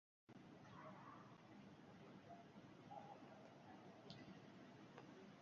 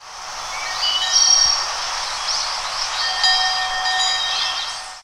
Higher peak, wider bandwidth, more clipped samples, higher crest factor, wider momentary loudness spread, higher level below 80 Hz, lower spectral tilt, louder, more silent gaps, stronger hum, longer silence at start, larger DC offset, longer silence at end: second, -40 dBFS vs -2 dBFS; second, 7.2 kHz vs 16 kHz; neither; about the same, 22 dB vs 18 dB; second, 4 LU vs 13 LU; second, -88 dBFS vs -48 dBFS; first, -5 dB/octave vs 3 dB/octave; second, -62 LUFS vs -17 LUFS; neither; neither; first, 0.3 s vs 0 s; neither; about the same, 0 s vs 0 s